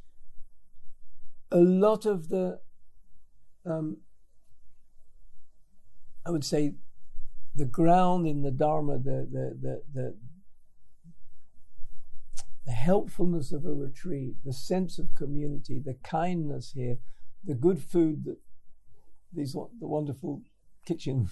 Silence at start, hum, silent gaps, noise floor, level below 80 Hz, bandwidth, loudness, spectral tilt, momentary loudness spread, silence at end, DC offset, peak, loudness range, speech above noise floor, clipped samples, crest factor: 0.05 s; none; none; -47 dBFS; -48 dBFS; 12.5 kHz; -30 LUFS; -7.5 dB/octave; 18 LU; 0 s; under 0.1%; -10 dBFS; 11 LU; 22 dB; under 0.1%; 16 dB